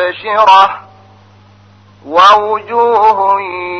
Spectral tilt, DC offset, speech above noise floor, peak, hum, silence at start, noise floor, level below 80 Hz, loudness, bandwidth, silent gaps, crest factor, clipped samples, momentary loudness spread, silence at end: -3 dB/octave; under 0.1%; 33 dB; 0 dBFS; none; 0 s; -42 dBFS; -54 dBFS; -9 LUFS; 8.8 kHz; none; 12 dB; 0.2%; 9 LU; 0 s